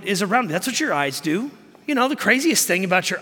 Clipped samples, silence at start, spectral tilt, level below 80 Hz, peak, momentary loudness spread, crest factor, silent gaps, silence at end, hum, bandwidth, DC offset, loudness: under 0.1%; 0 s; -3 dB/octave; -68 dBFS; -2 dBFS; 8 LU; 20 dB; none; 0 s; none; 17.5 kHz; under 0.1%; -20 LUFS